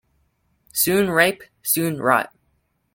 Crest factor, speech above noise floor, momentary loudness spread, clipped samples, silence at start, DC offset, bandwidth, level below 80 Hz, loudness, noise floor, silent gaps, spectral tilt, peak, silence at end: 20 dB; 48 dB; 11 LU; under 0.1%; 0.75 s; under 0.1%; 17 kHz; -58 dBFS; -20 LUFS; -68 dBFS; none; -3.5 dB/octave; -2 dBFS; 0.7 s